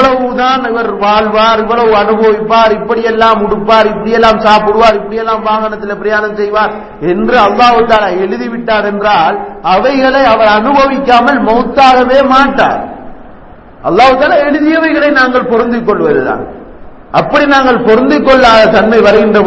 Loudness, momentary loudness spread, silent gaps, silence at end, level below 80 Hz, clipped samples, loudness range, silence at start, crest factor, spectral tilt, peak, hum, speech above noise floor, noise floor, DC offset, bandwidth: -8 LUFS; 8 LU; none; 0 s; -36 dBFS; 1%; 3 LU; 0 s; 8 dB; -5.5 dB/octave; 0 dBFS; none; 24 dB; -32 dBFS; under 0.1%; 8 kHz